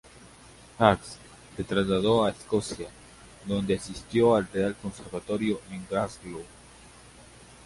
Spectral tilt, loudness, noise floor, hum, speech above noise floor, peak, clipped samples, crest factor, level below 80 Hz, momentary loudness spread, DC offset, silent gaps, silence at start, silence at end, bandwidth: -5.5 dB/octave; -27 LUFS; -51 dBFS; none; 24 dB; -2 dBFS; under 0.1%; 26 dB; -52 dBFS; 19 LU; under 0.1%; none; 0.25 s; 0.45 s; 11.5 kHz